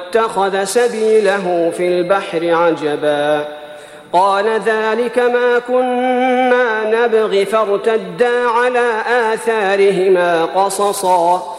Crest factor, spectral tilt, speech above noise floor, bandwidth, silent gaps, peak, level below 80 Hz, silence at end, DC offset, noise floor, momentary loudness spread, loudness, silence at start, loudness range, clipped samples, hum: 12 dB; -4 dB/octave; 20 dB; 14 kHz; none; -2 dBFS; -62 dBFS; 0 s; under 0.1%; -34 dBFS; 4 LU; -14 LUFS; 0 s; 2 LU; under 0.1%; none